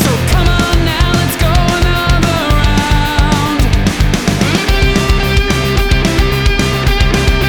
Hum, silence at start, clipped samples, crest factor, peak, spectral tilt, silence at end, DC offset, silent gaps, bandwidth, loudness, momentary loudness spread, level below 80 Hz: none; 0 s; under 0.1%; 10 dB; 0 dBFS; -5 dB/octave; 0 s; under 0.1%; none; over 20 kHz; -12 LUFS; 1 LU; -14 dBFS